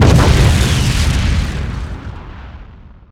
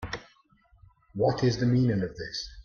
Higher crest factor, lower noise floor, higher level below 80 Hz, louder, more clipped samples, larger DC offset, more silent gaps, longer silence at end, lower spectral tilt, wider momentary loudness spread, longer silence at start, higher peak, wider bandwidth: about the same, 14 dB vs 16 dB; second, -37 dBFS vs -63 dBFS; first, -18 dBFS vs -52 dBFS; first, -14 LUFS vs -27 LUFS; neither; neither; neither; first, 0.4 s vs 0.05 s; about the same, -5.5 dB/octave vs -6.5 dB/octave; first, 22 LU vs 15 LU; about the same, 0 s vs 0 s; first, 0 dBFS vs -12 dBFS; first, 15.5 kHz vs 7 kHz